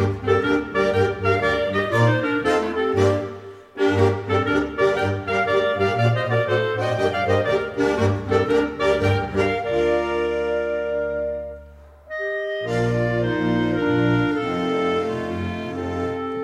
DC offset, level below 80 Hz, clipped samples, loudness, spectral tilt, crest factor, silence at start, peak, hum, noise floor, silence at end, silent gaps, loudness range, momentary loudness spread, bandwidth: under 0.1%; -46 dBFS; under 0.1%; -21 LUFS; -7 dB/octave; 16 dB; 0 s; -4 dBFS; none; -44 dBFS; 0 s; none; 4 LU; 7 LU; 12.5 kHz